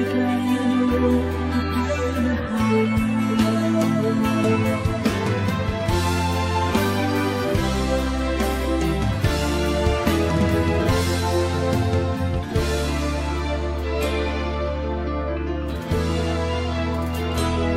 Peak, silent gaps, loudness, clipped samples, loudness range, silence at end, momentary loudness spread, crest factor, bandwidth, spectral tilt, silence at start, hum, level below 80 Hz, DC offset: -6 dBFS; none; -22 LUFS; under 0.1%; 4 LU; 0 s; 5 LU; 16 dB; 16 kHz; -6 dB/octave; 0 s; none; -30 dBFS; under 0.1%